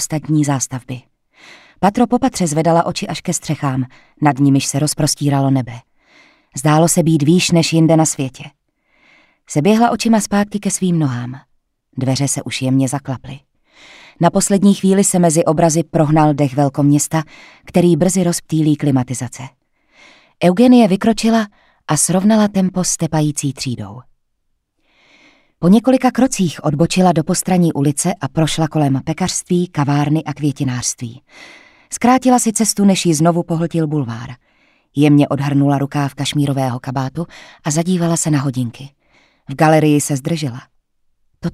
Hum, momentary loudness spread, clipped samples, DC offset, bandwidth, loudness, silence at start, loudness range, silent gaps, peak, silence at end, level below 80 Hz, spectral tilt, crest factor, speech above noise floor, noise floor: none; 13 LU; under 0.1%; under 0.1%; 15.5 kHz; -15 LUFS; 0 s; 4 LU; none; 0 dBFS; 0.05 s; -48 dBFS; -5.5 dB/octave; 16 dB; 52 dB; -67 dBFS